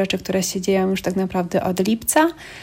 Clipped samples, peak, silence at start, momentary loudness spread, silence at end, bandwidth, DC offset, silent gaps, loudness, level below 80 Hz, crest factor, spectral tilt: under 0.1%; -2 dBFS; 0 s; 4 LU; 0 s; 16.5 kHz; under 0.1%; none; -20 LUFS; -50 dBFS; 18 dB; -4.5 dB/octave